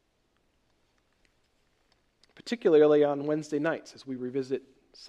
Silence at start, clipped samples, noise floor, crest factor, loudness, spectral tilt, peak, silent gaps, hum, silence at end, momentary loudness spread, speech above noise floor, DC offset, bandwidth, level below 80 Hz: 2.45 s; under 0.1%; -72 dBFS; 18 dB; -27 LUFS; -6.5 dB/octave; -12 dBFS; none; none; 0 s; 16 LU; 46 dB; under 0.1%; 9.2 kHz; -76 dBFS